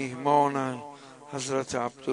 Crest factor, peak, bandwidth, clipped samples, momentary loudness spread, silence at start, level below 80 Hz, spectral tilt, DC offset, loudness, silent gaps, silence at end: 20 dB; -10 dBFS; 11 kHz; under 0.1%; 18 LU; 0 s; -68 dBFS; -5 dB/octave; under 0.1%; -28 LUFS; none; 0 s